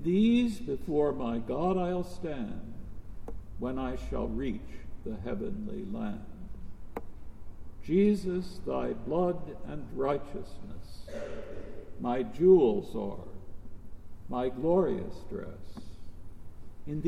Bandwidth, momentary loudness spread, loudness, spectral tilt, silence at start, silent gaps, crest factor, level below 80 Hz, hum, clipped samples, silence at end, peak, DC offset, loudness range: 12 kHz; 23 LU; -31 LUFS; -8 dB/octave; 0 s; none; 20 dB; -46 dBFS; none; under 0.1%; 0 s; -10 dBFS; under 0.1%; 9 LU